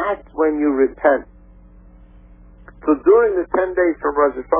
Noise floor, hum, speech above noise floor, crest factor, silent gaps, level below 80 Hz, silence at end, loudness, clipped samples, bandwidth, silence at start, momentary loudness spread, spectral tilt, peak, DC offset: -44 dBFS; none; 28 dB; 16 dB; none; -44 dBFS; 0 s; -18 LUFS; under 0.1%; 3.6 kHz; 0 s; 7 LU; -10 dB/octave; -2 dBFS; under 0.1%